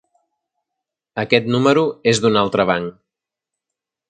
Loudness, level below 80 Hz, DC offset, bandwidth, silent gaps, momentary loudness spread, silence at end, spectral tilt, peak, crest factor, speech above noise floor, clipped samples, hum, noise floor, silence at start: -17 LUFS; -56 dBFS; under 0.1%; 9.4 kHz; none; 12 LU; 1.2 s; -5 dB/octave; 0 dBFS; 20 dB; 68 dB; under 0.1%; none; -84 dBFS; 1.15 s